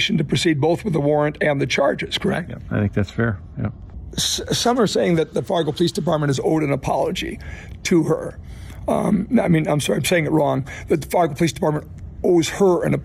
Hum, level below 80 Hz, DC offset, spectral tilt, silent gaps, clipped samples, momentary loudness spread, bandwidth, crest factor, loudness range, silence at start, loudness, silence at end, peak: none; -42 dBFS; under 0.1%; -5.5 dB/octave; none; under 0.1%; 11 LU; 15.5 kHz; 14 dB; 2 LU; 0 s; -20 LUFS; 0 s; -6 dBFS